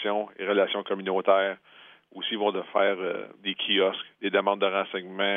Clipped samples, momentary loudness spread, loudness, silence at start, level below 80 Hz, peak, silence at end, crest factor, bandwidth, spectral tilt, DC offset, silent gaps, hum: under 0.1%; 9 LU; -27 LUFS; 0 s; -86 dBFS; -8 dBFS; 0 s; 20 dB; 3.8 kHz; -7.5 dB/octave; under 0.1%; none; none